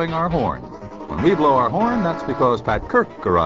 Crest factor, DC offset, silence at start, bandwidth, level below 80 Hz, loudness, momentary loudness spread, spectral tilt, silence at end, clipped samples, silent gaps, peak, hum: 16 dB; 0.3%; 0 s; 7.6 kHz; -40 dBFS; -19 LUFS; 14 LU; -8 dB/octave; 0 s; under 0.1%; none; -4 dBFS; none